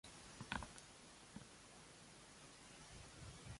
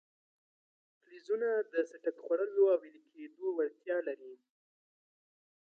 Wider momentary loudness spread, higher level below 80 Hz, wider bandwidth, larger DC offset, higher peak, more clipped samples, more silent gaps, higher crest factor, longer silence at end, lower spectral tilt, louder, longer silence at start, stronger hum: second, 11 LU vs 17 LU; first, -68 dBFS vs under -90 dBFS; first, 11.5 kHz vs 6.8 kHz; neither; second, -26 dBFS vs -18 dBFS; neither; neither; first, 32 dB vs 18 dB; second, 0 s vs 1.3 s; second, -3 dB/octave vs -5.5 dB/octave; second, -56 LUFS vs -34 LUFS; second, 0.05 s vs 1.1 s; neither